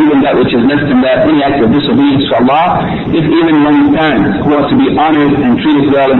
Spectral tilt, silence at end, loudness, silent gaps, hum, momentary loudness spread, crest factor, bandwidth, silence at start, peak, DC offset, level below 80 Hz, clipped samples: -9 dB/octave; 0 s; -9 LUFS; none; none; 3 LU; 6 dB; 4.2 kHz; 0 s; -2 dBFS; under 0.1%; -36 dBFS; under 0.1%